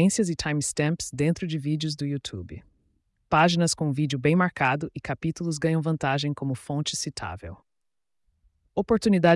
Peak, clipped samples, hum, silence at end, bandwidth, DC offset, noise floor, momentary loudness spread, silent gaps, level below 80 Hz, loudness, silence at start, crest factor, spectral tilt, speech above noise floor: -8 dBFS; under 0.1%; none; 0 s; 12 kHz; under 0.1%; -78 dBFS; 13 LU; none; -54 dBFS; -26 LUFS; 0 s; 16 dB; -5 dB/octave; 53 dB